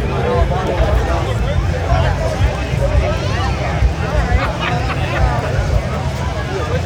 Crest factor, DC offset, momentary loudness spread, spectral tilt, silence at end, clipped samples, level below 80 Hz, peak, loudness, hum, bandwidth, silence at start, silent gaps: 14 dB; under 0.1%; 3 LU; -6.5 dB/octave; 0 s; under 0.1%; -20 dBFS; 0 dBFS; -17 LUFS; none; 11.5 kHz; 0 s; none